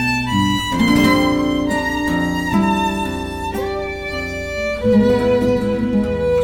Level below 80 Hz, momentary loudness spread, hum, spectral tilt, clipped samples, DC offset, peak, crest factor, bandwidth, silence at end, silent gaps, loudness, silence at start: -34 dBFS; 10 LU; none; -5.5 dB/octave; under 0.1%; under 0.1%; -2 dBFS; 14 dB; 17.5 kHz; 0 s; none; -18 LUFS; 0 s